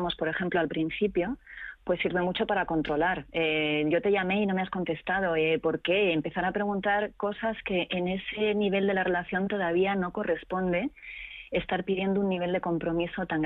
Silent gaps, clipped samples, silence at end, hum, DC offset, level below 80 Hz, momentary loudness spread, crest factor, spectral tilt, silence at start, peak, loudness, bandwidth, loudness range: none; under 0.1%; 0 s; none; under 0.1%; -54 dBFS; 6 LU; 12 dB; -8.5 dB/octave; 0 s; -16 dBFS; -28 LUFS; 4.5 kHz; 2 LU